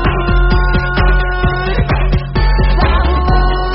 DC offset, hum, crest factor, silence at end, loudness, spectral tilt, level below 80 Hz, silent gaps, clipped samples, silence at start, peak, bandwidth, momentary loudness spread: under 0.1%; none; 12 dB; 0 s; -14 LUFS; -5 dB/octave; -12 dBFS; none; under 0.1%; 0 s; 0 dBFS; 5.8 kHz; 2 LU